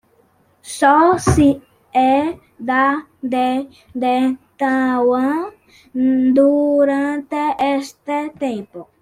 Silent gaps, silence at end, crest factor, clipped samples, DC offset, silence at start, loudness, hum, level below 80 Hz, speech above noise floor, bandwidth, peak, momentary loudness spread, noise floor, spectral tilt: none; 0.2 s; 16 dB; under 0.1%; under 0.1%; 0.65 s; -17 LUFS; none; -44 dBFS; 40 dB; 13 kHz; -2 dBFS; 12 LU; -57 dBFS; -6 dB/octave